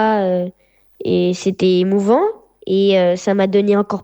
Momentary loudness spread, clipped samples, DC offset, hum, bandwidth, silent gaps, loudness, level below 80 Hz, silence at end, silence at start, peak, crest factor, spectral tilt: 8 LU; under 0.1%; under 0.1%; none; 19.5 kHz; none; -16 LUFS; -58 dBFS; 0 s; 0 s; -2 dBFS; 14 dB; -6.5 dB/octave